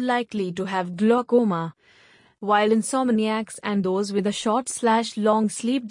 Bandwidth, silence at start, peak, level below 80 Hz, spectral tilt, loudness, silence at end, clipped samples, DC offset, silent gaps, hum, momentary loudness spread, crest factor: 11 kHz; 0 s; -6 dBFS; -70 dBFS; -5 dB/octave; -23 LUFS; 0 s; under 0.1%; under 0.1%; none; none; 8 LU; 16 dB